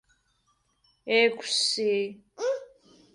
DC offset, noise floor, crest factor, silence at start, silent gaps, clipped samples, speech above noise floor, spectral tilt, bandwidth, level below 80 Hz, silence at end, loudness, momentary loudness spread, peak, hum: under 0.1%; -71 dBFS; 20 dB; 1.05 s; none; under 0.1%; 45 dB; -1.5 dB/octave; 11.5 kHz; -76 dBFS; 0.5 s; -26 LUFS; 13 LU; -10 dBFS; none